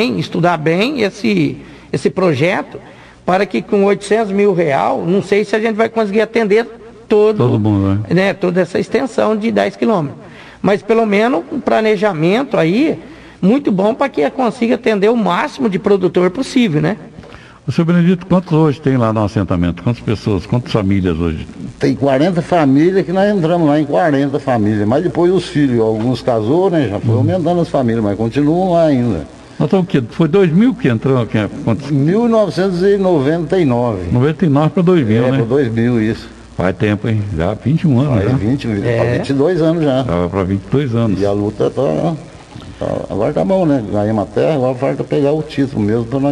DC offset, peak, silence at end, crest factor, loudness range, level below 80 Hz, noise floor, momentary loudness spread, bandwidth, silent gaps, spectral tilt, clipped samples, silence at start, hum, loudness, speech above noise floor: under 0.1%; 0 dBFS; 0 s; 12 dB; 3 LU; -38 dBFS; -36 dBFS; 6 LU; 11 kHz; none; -7.5 dB/octave; under 0.1%; 0 s; none; -14 LUFS; 22 dB